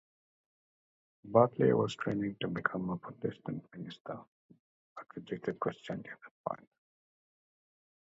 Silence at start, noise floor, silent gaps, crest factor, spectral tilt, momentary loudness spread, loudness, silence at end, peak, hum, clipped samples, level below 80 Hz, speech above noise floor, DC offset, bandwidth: 1.25 s; under -90 dBFS; 4.00-4.05 s, 4.28-4.49 s, 4.60-4.96 s, 6.31-6.44 s; 26 dB; -5.5 dB/octave; 20 LU; -34 LUFS; 1.45 s; -10 dBFS; none; under 0.1%; -70 dBFS; over 56 dB; under 0.1%; 7.6 kHz